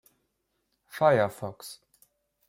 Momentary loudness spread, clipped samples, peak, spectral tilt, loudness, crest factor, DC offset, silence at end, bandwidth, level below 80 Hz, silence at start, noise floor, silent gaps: 21 LU; under 0.1%; -10 dBFS; -5.5 dB/octave; -25 LUFS; 22 dB; under 0.1%; 0.75 s; 16.5 kHz; -74 dBFS; 0.95 s; -78 dBFS; none